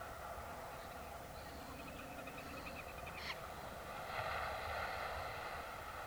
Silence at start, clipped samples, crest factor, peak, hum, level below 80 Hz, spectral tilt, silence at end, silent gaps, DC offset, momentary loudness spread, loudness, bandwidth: 0 s; under 0.1%; 18 dB; -30 dBFS; none; -60 dBFS; -4 dB/octave; 0 s; none; under 0.1%; 8 LU; -46 LUFS; over 20 kHz